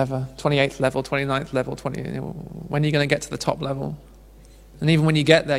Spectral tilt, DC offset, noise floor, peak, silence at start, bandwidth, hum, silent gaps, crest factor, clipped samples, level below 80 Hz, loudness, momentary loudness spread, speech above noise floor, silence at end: -6 dB/octave; under 0.1%; -46 dBFS; 0 dBFS; 0 s; 13 kHz; none; none; 22 dB; under 0.1%; -48 dBFS; -23 LUFS; 13 LU; 24 dB; 0 s